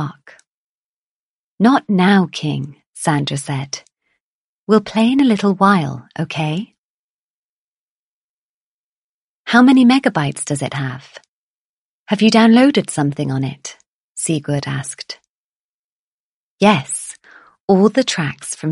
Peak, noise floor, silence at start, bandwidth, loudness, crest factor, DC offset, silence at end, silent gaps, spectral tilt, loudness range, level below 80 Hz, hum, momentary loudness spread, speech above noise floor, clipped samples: 0 dBFS; under -90 dBFS; 0 s; 11.5 kHz; -16 LUFS; 18 dB; under 0.1%; 0 s; 0.47-1.58 s, 2.86-2.94 s, 4.20-4.67 s, 6.78-9.44 s, 11.28-12.06 s, 13.86-14.15 s, 15.28-16.58 s, 17.60-17.68 s; -5.5 dB/octave; 8 LU; -60 dBFS; none; 18 LU; over 75 dB; under 0.1%